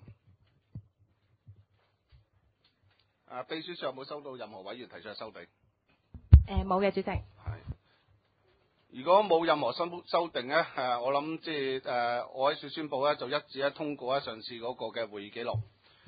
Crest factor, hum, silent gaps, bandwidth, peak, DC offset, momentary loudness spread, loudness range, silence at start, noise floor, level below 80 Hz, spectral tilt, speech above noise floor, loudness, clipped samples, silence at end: 30 dB; none; none; 4.9 kHz; -2 dBFS; under 0.1%; 19 LU; 13 LU; 0.05 s; -72 dBFS; -38 dBFS; -5 dB/octave; 40 dB; -31 LUFS; under 0.1%; 0.45 s